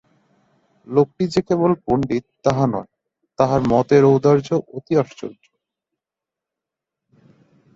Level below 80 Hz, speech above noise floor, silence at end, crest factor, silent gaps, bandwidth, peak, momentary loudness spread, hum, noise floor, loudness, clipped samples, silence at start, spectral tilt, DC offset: -52 dBFS; 69 dB; 2.45 s; 18 dB; none; 7.8 kHz; -2 dBFS; 10 LU; none; -86 dBFS; -19 LUFS; under 0.1%; 0.9 s; -8 dB/octave; under 0.1%